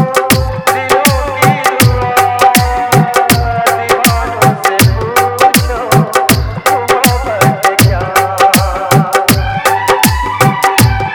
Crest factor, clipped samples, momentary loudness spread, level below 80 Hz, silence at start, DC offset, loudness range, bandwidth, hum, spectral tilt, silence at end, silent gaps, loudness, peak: 10 dB; 0.8%; 3 LU; -24 dBFS; 0 s; under 0.1%; 0 LU; over 20 kHz; none; -4.5 dB/octave; 0 s; none; -10 LUFS; 0 dBFS